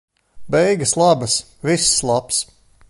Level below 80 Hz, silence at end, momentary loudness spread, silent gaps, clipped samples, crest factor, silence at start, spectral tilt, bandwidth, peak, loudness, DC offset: -48 dBFS; 0.45 s; 7 LU; none; under 0.1%; 16 dB; 0.35 s; -3 dB/octave; 12 kHz; -2 dBFS; -17 LUFS; under 0.1%